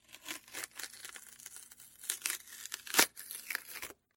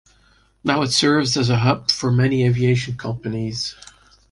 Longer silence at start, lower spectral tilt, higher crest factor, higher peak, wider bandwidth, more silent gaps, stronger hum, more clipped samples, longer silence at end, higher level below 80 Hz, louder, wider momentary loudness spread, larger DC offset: second, 0.1 s vs 0.65 s; second, 1 dB/octave vs -5 dB/octave; first, 36 dB vs 18 dB; about the same, -4 dBFS vs -2 dBFS; first, 17 kHz vs 11.5 kHz; neither; neither; neither; second, 0.25 s vs 0.6 s; second, -80 dBFS vs -48 dBFS; second, -36 LUFS vs -19 LUFS; first, 20 LU vs 10 LU; neither